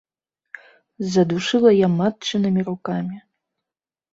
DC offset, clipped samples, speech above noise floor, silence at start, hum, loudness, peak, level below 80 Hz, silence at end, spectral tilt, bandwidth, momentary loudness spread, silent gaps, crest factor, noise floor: under 0.1%; under 0.1%; 70 dB; 1 s; none; -20 LUFS; -4 dBFS; -62 dBFS; 0.95 s; -6.5 dB/octave; 7.8 kHz; 14 LU; none; 18 dB; -89 dBFS